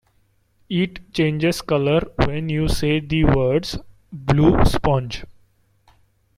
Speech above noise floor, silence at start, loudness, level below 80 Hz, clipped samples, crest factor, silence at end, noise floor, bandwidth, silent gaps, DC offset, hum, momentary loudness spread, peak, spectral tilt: 43 dB; 0.7 s; -20 LUFS; -30 dBFS; under 0.1%; 18 dB; 1.05 s; -62 dBFS; 15.5 kHz; none; under 0.1%; none; 13 LU; -2 dBFS; -6.5 dB/octave